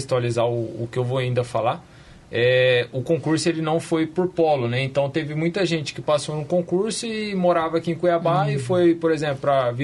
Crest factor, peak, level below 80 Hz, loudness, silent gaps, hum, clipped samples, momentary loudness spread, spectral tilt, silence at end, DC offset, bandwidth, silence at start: 14 dB; -8 dBFS; -56 dBFS; -22 LUFS; none; none; under 0.1%; 6 LU; -6 dB/octave; 0 s; under 0.1%; 11.5 kHz; 0 s